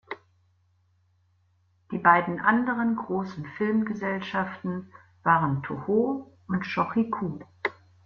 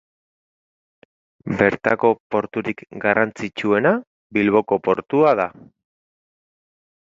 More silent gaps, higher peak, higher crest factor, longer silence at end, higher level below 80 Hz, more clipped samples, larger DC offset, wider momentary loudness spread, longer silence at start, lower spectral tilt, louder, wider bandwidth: second, none vs 2.20-2.30 s, 4.07-4.30 s; second, -4 dBFS vs 0 dBFS; about the same, 24 dB vs 22 dB; second, 0.35 s vs 1.55 s; second, -66 dBFS vs -58 dBFS; neither; neither; first, 13 LU vs 9 LU; second, 0.1 s vs 1.45 s; first, -8.5 dB/octave vs -7 dB/octave; second, -27 LUFS vs -20 LUFS; second, 6.6 kHz vs 7.8 kHz